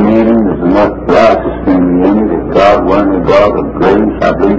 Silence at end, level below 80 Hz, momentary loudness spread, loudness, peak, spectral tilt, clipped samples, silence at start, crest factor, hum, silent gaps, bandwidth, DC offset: 0 s; -28 dBFS; 4 LU; -9 LUFS; 0 dBFS; -8 dB/octave; 2%; 0 s; 8 dB; none; none; 8 kHz; under 0.1%